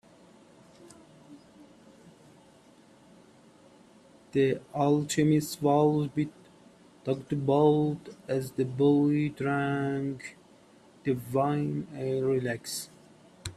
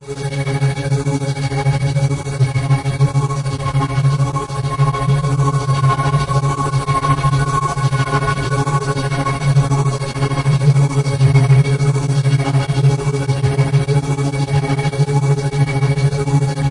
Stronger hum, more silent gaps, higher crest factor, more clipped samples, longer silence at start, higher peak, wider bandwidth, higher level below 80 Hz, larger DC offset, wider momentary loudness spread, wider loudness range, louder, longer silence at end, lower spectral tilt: neither; neither; first, 20 dB vs 14 dB; neither; first, 0.8 s vs 0 s; second, -10 dBFS vs -2 dBFS; first, 14 kHz vs 11 kHz; second, -66 dBFS vs -36 dBFS; neither; first, 12 LU vs 5 LU; about the same, 5 LU vs 3 LU; second, -28 LUFS vs -16 LUFS; about the same, 0.05 s vs 0 s; about the same, -6.5 dB/octave vs -6.5 dB/octave